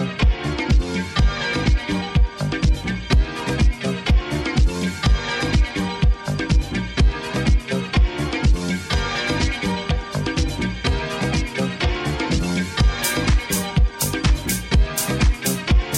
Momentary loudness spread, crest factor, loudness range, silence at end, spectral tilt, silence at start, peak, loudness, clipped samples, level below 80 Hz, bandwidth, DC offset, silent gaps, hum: 3 LU; 14 dB; 2 LU; 0 s; -5 dB/octave; 0 s; -6 dBFS; -21 LUFS; under 0.1%; -22 dBFS; 17 kHz; under 0.1%; none; none